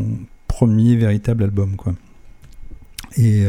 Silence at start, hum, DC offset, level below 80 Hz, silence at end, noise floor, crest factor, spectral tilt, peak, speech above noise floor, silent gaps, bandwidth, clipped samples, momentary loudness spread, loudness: 0 s; none; under 0.1%; -34 dBFS; 0 s; -40 dBFS; 16 dB; -8.5 dB/octave; -2 dBFS; 25 dB; none; 14 kHz; under 0.1%; 16 LU; -18 LUFS